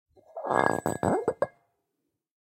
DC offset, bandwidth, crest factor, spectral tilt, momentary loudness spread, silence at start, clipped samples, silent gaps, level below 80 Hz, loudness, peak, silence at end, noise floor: under 0.1%; 16.5 kHz; 26 dB; -6 dB/octave; 11 LU; 0.35 s; under 0.1%; none; -64 dBFS; -28 LUFS; -4 dBFS; 1 s; -82 dBFS